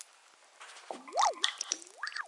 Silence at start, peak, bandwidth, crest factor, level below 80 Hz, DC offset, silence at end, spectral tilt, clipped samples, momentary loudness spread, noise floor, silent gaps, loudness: 0 s; -10 dBFS; 11.5 kHz; 28 dB; under -90 dBFS; under 0.1%; 0 s; 2.5 dB/octave; under 0.1%; 22 LU; -61 dBFS; none; -33 LUFS